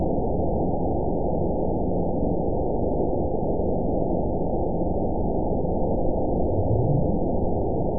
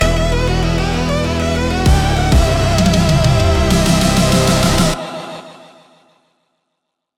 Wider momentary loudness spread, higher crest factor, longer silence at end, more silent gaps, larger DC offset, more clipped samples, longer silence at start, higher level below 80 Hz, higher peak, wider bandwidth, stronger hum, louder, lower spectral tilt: second, 2 LU vs 5 LU; about the same, 14 dB vs 14 dB; second, 0 s vs 1.65 s; neither; first, 3% vs under 0.1%; neither; about the same, 0 s vs 0 s; second, -32 dBFS vs -20 dBFS; second, -10 dBFS vs 0 dBFS; second, 1 kHz vs 17.5 kHz; neither; second, -25 LUFS vs -14 LUFS; first, -19 dB/octave vs -5 dB/octave